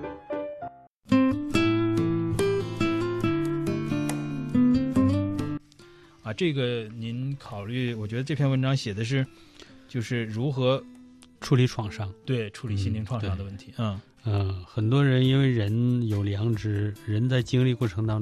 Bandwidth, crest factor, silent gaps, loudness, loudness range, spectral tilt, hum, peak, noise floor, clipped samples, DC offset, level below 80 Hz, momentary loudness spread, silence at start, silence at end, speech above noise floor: 13 kHz; 18 dB; 0.87-1.00 s; -27 LUFS; 4 LU; -7 dB/octave; none; -8 dBFS; -52 dBFS; under 0.1%; under 0.1%; -52 dBFS; 11 LU; 0 s; 0 s; 26 dB